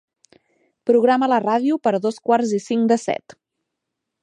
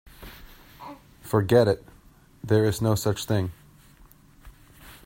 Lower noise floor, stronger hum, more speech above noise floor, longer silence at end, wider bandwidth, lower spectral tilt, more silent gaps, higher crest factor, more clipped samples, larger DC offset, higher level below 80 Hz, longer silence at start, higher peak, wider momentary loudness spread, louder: first, -80 dBFS vs -54 dBFS; neither; first, 62 dB vs 32 dB; first, 1.1 s vs 0.15 s; second, 10 kHz vs 16.5 kHz; about the same, -5.5 dB/octave vs -6.5 dB/octave; neither; second, 16 dB vs 22 dB; neither; neither; second, -74 dBFS vs -52 dBFS; first, 0.85 s vs 0.2 s; about the same, -4 dBFS vs -6 dBFS; second, 8 LU vs 24 LU; first, -19 LUFS vs -24 LUFS